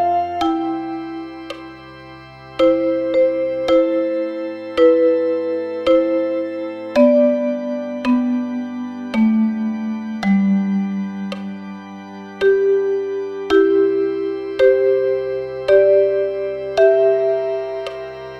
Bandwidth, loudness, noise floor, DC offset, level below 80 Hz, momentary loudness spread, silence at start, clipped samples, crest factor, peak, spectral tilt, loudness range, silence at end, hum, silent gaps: 7.8 kHz; -18 LUFS; -38 dBFS; under 0.1%; -54 dBFS; 16 LU; 0 s; under 0.1%; 16 dB; -2 dBFS; -7.5 dB/octave; 4 LU; 0 s; none; none